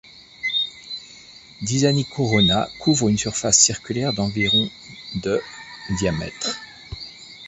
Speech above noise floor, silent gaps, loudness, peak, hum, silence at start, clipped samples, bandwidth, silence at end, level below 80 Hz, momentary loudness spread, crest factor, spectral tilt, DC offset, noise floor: 24 dB; none; -20 LUFS; -2 dBFS; none; 0.15 s; under 0.1%; 8.4 kHz; 0 s; -46 dBFS; 18 LU; 22 dB; -3 dB/octave; under 0.1%; -45 dBFS